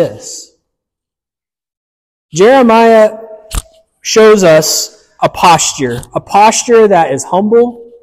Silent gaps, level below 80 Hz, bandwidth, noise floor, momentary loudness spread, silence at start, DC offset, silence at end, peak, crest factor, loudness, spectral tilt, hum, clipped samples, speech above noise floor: 1.77-2.29 s; -36 dBFS; 15.5 kHz; -90 dBFS; 18 LU; 0 s; under 0.1%; 0.2 s; 0 dBFS; 10 dB; -8 LUFS; -3.5 dB/octave; none; under 0.1%; 82 dB